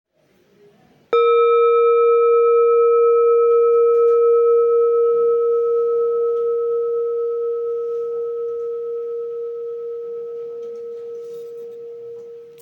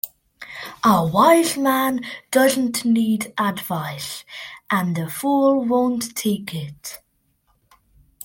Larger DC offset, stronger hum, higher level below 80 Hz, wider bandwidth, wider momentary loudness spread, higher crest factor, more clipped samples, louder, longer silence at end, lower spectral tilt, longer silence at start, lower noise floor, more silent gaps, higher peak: neither; neither; second, -78 dBFS vs -60 dBFS; second, 3.9 kHz vs 17 kHz; about the same, 18 LU vs 18 LU; second, 12 dB vs 20 dB; neither; first, -17 LUFS vs -20 LUFS; second, 0.1 s vs 1.3 s; about the same, -5 dB/octave vs -4.5 dB/octave; first, 1.1 s vs 0.05 s; second, -58 dBFS vs -65 dBFS; neither; second, -6 dBFS vs -2 dBFS